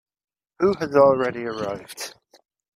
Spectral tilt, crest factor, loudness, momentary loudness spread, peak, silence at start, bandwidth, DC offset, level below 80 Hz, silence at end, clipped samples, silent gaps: -5.5 dB/octave; 20 dB; -21 LUFS; 17 LU; -4 dBFS; 0.6 s; 15 kHz; under 0.1%; -60 dBFS; 0.65 s; under 0.1%; none